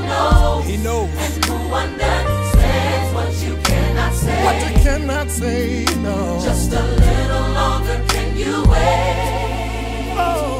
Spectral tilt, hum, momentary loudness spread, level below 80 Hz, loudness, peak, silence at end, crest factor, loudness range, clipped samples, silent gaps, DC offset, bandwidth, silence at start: -5 dB/octave; none; 5 LU; -20 dBFS; -18 LUFS; 0 dBFS; 0 s; 16 dB; 1 LU; under 0.1%; none; under 0.1%; 16 kHz; 0 s